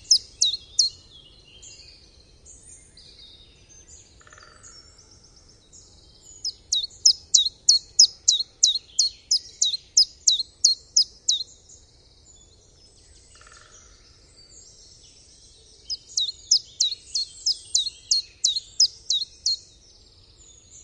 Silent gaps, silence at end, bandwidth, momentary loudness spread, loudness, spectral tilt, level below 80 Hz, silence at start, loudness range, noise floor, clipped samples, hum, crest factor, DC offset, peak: none; 1.25 s; 11.5 kHz; 10 LU; -21 LUFS; 3 dB/octave; -58 dBFS; 0.1 s; 14 LU; -54 dBFS; under 0.1%; none; 26 dB; under 0.1%; 0 dBFS